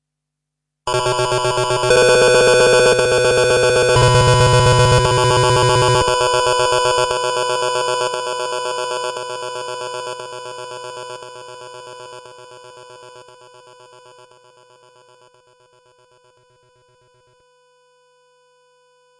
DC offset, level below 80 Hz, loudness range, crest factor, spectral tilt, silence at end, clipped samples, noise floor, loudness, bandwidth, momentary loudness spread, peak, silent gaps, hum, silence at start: under 0.1%; -38 dBFS; 20 LU; 16 dB; -4 dB/octave; 6 s; under 0.1%; -80 dBFS; -15 LUFS; 11.5 kHz; 20 LU; -2 dBFS; none; 50 Hz at -40 dBFS; 0.85 s